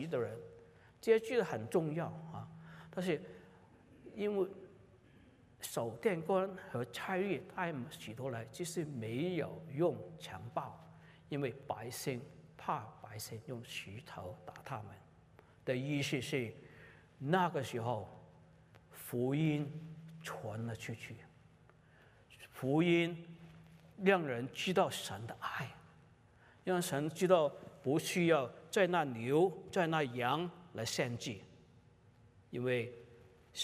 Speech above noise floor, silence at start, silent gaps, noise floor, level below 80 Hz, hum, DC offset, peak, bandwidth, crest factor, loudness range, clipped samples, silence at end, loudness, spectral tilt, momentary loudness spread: 28 dB; 0 s; none; -64 dBFS; -74 dBFS; none; under 0.1%; -16 dBFS; 15.5 kHz; 22 dB; 9 LU; under 0.1%; 0 s; -37 LUFS; -5.5 dB/octave; 18 LU